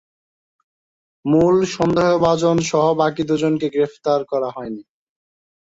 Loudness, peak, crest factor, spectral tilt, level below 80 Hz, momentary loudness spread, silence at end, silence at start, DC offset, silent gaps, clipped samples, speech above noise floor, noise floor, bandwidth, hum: -18 LUFS; -2 dBFS; 16 dB; -6 dB/octave; -52 dBFS; 11 LU; 0.95 s; 1.25 s; under 0.1%; none; under 0.1%; over 73 dB; under -90 dBFS; 8 kHz; none